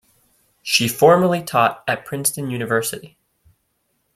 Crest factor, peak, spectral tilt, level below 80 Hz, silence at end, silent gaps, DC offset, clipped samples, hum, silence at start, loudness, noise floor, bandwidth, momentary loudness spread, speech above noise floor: 18 dB; -2 dBFS; -3.5 dB/octave; -60 dBFS; 1.1 s; none; under 0.1%; under 0.1%; none; 0.65 s; -18 LUFS; -69 dBFS; 16.5 kHz; 13 LU; 51 dB